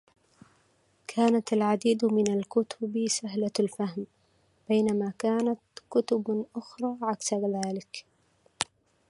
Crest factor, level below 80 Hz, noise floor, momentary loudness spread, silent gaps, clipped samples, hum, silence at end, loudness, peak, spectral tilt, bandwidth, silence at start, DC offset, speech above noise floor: 24 dB; -74 dBFS; -67 dBFS; 12 LU; none; under 0.1%; none; 0.45 s; -29 LUFS; -6 dBFS; -5 dB/octave; 11.5 kHz; 1.1 s; under 0.1%; 40 dB